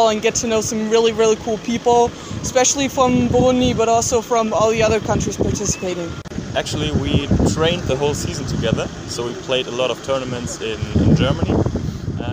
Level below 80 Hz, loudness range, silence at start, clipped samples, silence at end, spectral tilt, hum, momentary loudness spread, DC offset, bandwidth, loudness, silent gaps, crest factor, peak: -34 dBFS; 4 LU; 0 s; under 0.1%; 0 s; -4.5 dB/octave; none; 9 LU; under 0.1%; 16 kHz; -18 LUFS; none; 16 dB; -2 dBFS